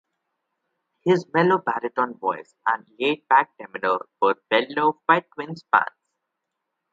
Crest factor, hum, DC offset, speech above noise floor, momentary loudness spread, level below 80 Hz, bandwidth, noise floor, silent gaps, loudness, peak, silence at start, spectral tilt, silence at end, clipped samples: 22 dB; none; under 0.1%; 58 dB; 9 LU; -76 dBFS; 7.6 kHz; -81 dBFS; none; -22 LUFS; -2 dBFS; 1.05 s; -6.5 dB/octave; 1.05 s; under 0.1%